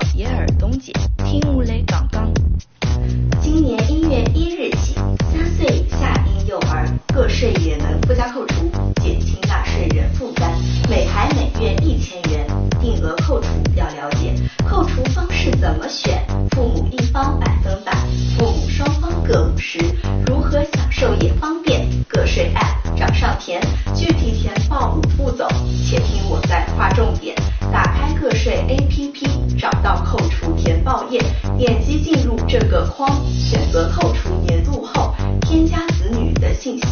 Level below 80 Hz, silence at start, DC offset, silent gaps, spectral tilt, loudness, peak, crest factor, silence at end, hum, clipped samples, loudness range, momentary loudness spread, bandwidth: -20 dBFS; 0 s; under 0.1%; none; -6.5 dB/octave; -18 LUFS; 0 dBFS; 16 dB; 0 s; none; under 0.1%; 1 LU; 3 LU; 6.8 kHz